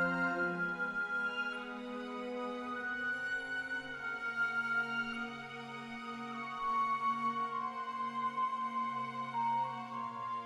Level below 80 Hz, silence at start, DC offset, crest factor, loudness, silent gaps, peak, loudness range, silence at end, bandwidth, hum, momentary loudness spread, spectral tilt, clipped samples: -72 dBFS; 0 s; under 0.1%; 16 dB; -37 LUFS; none; -22 dBFS; 2 LU; 0 s; 12 kHz; none; 9 LU; -5 dB/octave; under 0.1%